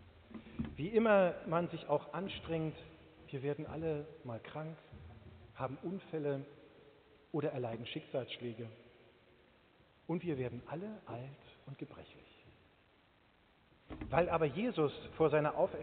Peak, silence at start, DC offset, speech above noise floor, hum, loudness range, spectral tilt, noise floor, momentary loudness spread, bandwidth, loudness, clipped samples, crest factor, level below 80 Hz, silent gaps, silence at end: -14 dBFS; 0 s; under 0.1%; 32 dB; none; 9 LU; -5.5 dB/octave; -69 dBFS; 22 LU; 4.5 kHz; -38 LUFS; under 0.1%; 24 dB; -64 dBFS; none; 0 s